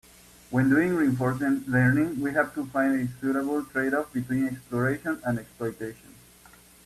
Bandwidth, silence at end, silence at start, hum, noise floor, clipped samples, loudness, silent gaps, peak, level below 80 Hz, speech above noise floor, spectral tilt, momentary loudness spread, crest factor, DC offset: 14.5 kHz; 0.75 s; 0.5 s; none; -53 dBFS; under 0.1%; -26 LUFS; none; -10 dBFS; -58 dBFS; 28 dB; -7.5 dB/octave; 9 LU; 18 dB; under 0.1%